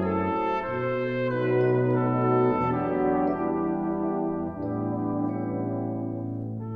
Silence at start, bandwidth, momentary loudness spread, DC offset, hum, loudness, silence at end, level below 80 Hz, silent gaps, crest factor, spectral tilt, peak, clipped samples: 0 s; 5.2 kHz; 8 LU; under 0.1%; none; -27 LUFS; 0 s; -54 dBFS; none; 14 dB; -10.5 dB/octave; -12 dBFS; under 0.1%